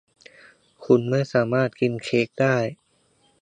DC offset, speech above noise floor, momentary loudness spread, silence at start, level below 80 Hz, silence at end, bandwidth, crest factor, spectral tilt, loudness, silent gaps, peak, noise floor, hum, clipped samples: under 0.1%; 42 dB; 5 LU; 0.8 s; -66 dBFS; 0.7 s; 9.8 kHz; 20 dB; -7 dB/octave; -22 LUFS; none; -4 dBFS; -64 dBFS; none; under 0.1%